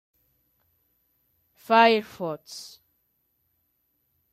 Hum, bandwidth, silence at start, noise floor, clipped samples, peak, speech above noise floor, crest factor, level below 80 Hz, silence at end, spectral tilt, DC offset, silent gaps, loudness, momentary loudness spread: none; 14.5 kHz; 1.7 s; -73 dBFS; under 0.1%; -6 dBFS; 50 dB; 22 dB; -78 dBFS; 1.65 s; -4 dB/octave; under 0.1%; none; -22 LUFS; 22 LU